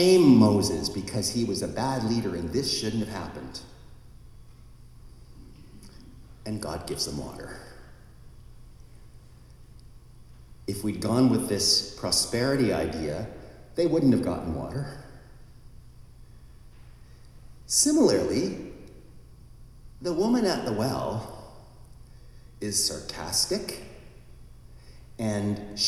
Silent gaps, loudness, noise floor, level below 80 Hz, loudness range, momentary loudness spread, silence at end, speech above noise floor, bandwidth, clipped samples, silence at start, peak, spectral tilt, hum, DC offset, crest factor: none; -26 LUFS; -49 dBFS; -50 dBFS; 14 LU; 19 LU; 0 s; 24 dB; 15 kHz; under 0.1%; 0 s; -8 dBFS; -4.5 dB/octave; none; under 0.1%; 20 dB